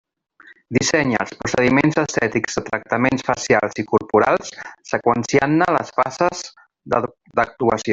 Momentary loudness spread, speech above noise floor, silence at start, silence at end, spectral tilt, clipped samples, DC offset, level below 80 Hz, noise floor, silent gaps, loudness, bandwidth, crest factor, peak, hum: 7 LU; 30 dB; 0.7 s; 0 s; -5 dB/octave; under 0.1%; under 0.1%; -52 dBFS; -49 dBFS; none; -19 LUFS; 8 kHz; 18 dB; -2 dBFS; none